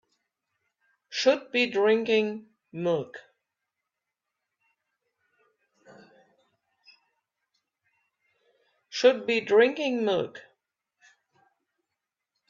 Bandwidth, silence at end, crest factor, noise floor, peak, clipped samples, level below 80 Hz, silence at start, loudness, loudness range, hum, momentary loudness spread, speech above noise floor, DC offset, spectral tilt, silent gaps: 7.6 kHz; 2.1 s; 24 dB; -86 dBFS; -6 dBFS; under 0.1%; -78 dBFS; 1.1 s; -25 LUFS; 11 LU; none; 16 LU; 62 dB; under 0.1%; -4.5 dB/octave; none